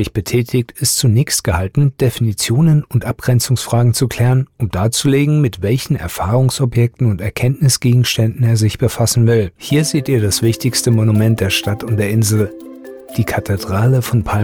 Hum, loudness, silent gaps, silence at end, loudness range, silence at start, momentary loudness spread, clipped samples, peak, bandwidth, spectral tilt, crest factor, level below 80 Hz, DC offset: none; -15 LUFS; none; 0 s; 1 LU; 0 s; 6 LU; under 0.1%; -4 dBFS; 17.5 kHz; -5.5 dB/octave; 10 dB; -38 dBFS; under 0.1%